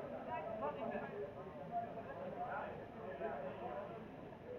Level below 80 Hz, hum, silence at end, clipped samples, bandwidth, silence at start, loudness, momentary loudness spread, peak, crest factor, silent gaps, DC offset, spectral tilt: -70 dBFS; none; 0 s; under 0.1%; 13 kHz; 0 s; -46 LUFS; 7 LU; -30 dBFS; 16 dB; none; under 0.1%; -8 dB/octave